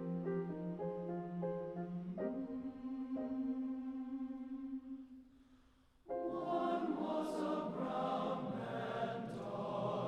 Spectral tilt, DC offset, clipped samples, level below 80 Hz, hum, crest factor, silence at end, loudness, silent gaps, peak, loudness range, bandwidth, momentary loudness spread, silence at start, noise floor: -8 dB/octave; under 0.1%; under 0.1%; -72 dBFS; none; 14 dB; 0 s; -42 LUFS; none; -26 dBFS; 5 LU; 11.5 kHz; 7 LU; 0 s; -68 dBFS